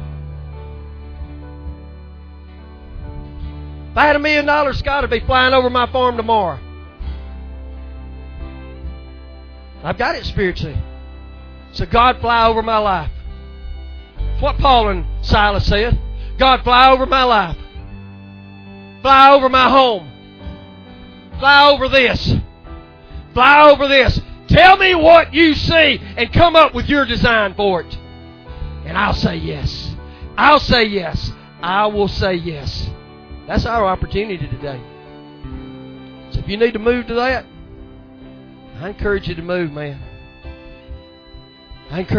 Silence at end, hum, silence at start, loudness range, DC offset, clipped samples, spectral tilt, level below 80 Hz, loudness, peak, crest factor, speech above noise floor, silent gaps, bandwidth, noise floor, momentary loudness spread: 0 s; none; 0 s; 15 LU; under 0.1%; under 0.1%; -6 dB/octave; -28 dBFS; -14 LUFS; 0 dBFS; 16 dB; 27 dB; none; 5.4 kHz; -40 dBFS; 24 LU